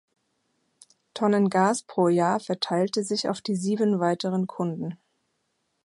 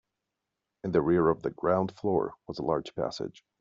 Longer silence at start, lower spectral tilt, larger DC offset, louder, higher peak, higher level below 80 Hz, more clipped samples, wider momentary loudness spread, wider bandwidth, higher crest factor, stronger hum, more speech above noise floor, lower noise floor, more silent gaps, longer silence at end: first, 1.15 s vs 0.85 s; about the same, -5.5 dB/octave vs -6.5 dB/octave; neither; first, -25 LUFS vs -29 LUFS; about the same, -8 dBFS vs -10 dBFS; second, -74 dBFS vs -60 dBFS; neither; second, 8 LU vs 12 LU; first, 11.5 kHz vs 7.6 kHz; about the same, 18 dB vs 20 dB; neither; second, 51 dB vs 57 dB; second, -75 dBFS vs -86 dBFS; neither; first, 0.9 s vs 0.3 s